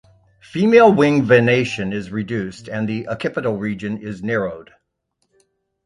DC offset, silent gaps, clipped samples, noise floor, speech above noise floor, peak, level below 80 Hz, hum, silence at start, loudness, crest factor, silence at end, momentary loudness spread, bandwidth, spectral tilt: under 0.1%; none; under 0.1%; -71 dBFS; 54 dB; 0 dBFS; -54 dBFS; none; 0.55 s; -18 LUFS; 18 dB; 1.25 s; 15 LU; 10.5 kHz; -7 dB/octave